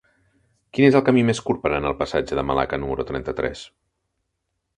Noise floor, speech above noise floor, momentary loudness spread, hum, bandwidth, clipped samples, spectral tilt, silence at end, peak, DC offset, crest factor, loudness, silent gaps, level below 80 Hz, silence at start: -77 dBFS; 56 dB; 11 LU; none; 10 kHz; under 0.1%; -6.5 dB/octave; 1.1 s; -2 dBFS; under 0.1%; 20 dB; -21 LUFS; none; -44 dBFS; 0.75 s